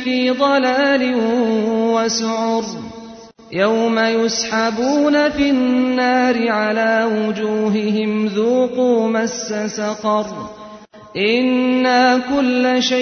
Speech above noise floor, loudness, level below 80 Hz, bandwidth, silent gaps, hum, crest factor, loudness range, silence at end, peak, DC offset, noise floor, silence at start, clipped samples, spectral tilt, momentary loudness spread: 22 dB; -16 LUFS; -52 dBFS; 6.6 kHz; none; none; 14 dB; 3 LU; 0 s; -2 dBFS; under 0.1%; -38 dBFS; 0 s; under 0.1%; -4 dB/octave; 7 LU